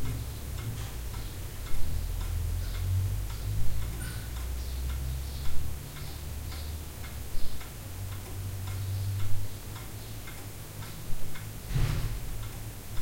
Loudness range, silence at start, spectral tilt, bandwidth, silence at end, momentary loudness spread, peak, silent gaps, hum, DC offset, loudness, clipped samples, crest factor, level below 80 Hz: 4 LU; 0 s; -5 dB/octave; 16.5 kHz; 0 s; 9 LU; -12 dBFS; none; none; under 0.1%; -37 LUFS; under 0.1%; 16 dB; -36 dBFS